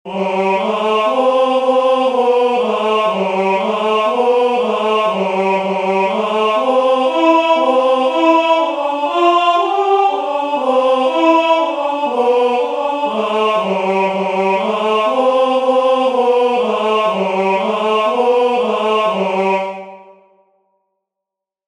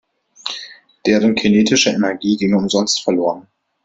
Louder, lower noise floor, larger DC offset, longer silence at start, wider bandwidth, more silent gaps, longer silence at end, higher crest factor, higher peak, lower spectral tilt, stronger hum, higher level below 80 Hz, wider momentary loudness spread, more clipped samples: about the same, -14 LUFS vs -16 LUFS; first, -83 dBFS vs -37 dBFS; neither; second, 0.05 s vs 0.45 s; first, 10.5 kHz vs 8 kHz; neither; first, 1.7 s vs 0.45 s; about the same, 14 dB vs 16 dB; about the same, 0 dBFS vs 0 dBFS; about the same, -5 dB/octave vs -4 dB/octave; neither; second, -66 dBFS vs -54 dBFS; second, 5 LU vs 15 LU; neither